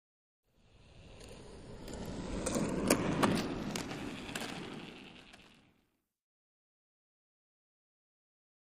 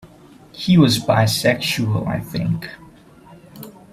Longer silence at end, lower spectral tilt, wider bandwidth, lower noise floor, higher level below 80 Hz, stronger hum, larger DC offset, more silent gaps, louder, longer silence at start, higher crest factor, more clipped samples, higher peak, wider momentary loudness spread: first, 2.9 s vs 0.25 s; about the same, -4.5 dB/octave vs -5.5 dB/octave; about the same, 15.5 kHz vs 16 kHz; first, -78 dBFS vs -45 dBFS; second, -56 dBFS vs -50 dBFS; neither; neither; neither; second, -36 LUFS vs -18 LUFS; first, 0.75 s vs 0.05 s; first, 28 dB vs 18 dB; neither; second, -12 dBFS vs -2 dBFS; about the same, 22 LU vs 23 LU